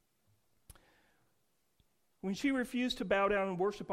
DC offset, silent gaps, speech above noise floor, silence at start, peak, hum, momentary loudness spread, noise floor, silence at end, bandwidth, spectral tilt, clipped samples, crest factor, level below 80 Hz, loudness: under 0.1%; none; 46 dB; 2.25 s; -18 dBFS; none; 7 LU; -79 dBFS; 0 s; 15.5 kHz; -5 dB/octave; under 0.1%; 18 dB; -64 dBFS; -34 LUFS